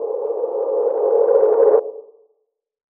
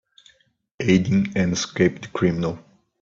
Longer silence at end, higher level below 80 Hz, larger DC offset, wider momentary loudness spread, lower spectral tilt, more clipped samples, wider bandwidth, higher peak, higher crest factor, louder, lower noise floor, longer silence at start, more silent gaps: first, 0.9 s vs 0.4 s; second, -70 dBFS vs -52 dBFS; neither; about the same, 9 LU vs 9 LU; first, -10 dB/octave vs -6 dB/octave; neither; second, 2.2 kHz vs 7.6 kHz; about the same, -4 dBFS vs -4 dBFS; about the same, 14 dB vs 18 dB; first, -17 LUFS vs -22 LUFS; first, -70 dBFS vs -64 dBFS; second, 0 s vs 0.8 s; neither